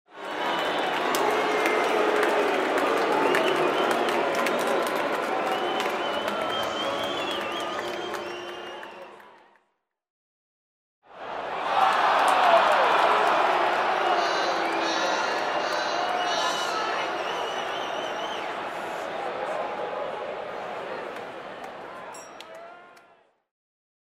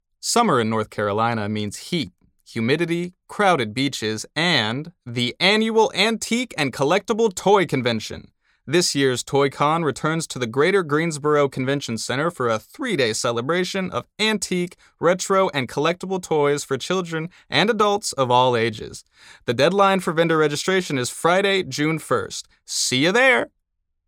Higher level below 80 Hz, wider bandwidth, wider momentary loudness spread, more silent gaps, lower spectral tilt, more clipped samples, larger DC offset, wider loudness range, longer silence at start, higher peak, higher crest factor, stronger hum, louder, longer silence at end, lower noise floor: second, -68 dBFS vs -60 dBFS; about the same, 16 kHz vs 17 kHz; first, 17 LU vs 9 LU; first, 10.10-11.02 s vs none; second, -2.5 dB/octave vs -4 dB/octave; neither; neither; first, 14 LU vs 3 LU; second, 0.1 s vs 0.25 s; second, -6 dBFS vs -2 dBFS; about the same, 20 dB vs 18 dB; neither; second, -25 LUFS vs -21 LUFS; first, 1.15 s vs 0.6 s; about the same, -74 dBFS vs -74 dBFS